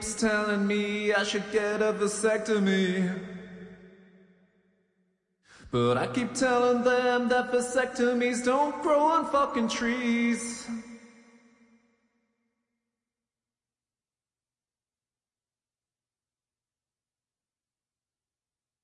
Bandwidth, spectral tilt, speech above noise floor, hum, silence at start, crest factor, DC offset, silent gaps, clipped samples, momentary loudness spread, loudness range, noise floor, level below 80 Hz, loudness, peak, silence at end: 11.5 kHz; -4.5 dB/octave; over 64 dB; none; 0 s; 16 dB; under 0.1%; none; under 0.1%; 9 LU; 9 LU; under -90 dBFS; -64 dBFS; -26 LUFS; -14 dBFS; 7.75 s